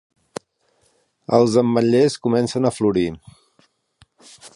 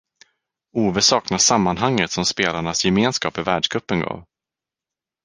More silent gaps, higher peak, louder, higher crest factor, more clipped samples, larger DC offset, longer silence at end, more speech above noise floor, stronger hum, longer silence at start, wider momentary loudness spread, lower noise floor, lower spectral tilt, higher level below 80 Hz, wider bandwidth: neither; about the same, -2 dBFS vs -2 dBFS; about the same, -18 LUFS vs -19 LUFS; about the same, 20 dB vs 20 dB; neither; neither; second, 0.05 s vs 1.05 s; second, 46 dB vs 69 dB; neither; first, 1.3 s vs 0.75 s; first, 21 LU vs 8 LU; second, -64 dBFS vs -88 dBFS; first, -6.5 dB/octave vs -3 dB/octave; about the same, -54 dBFS vs -50 dBFS; about the same, 11.5 kHz vs 10.5 kHz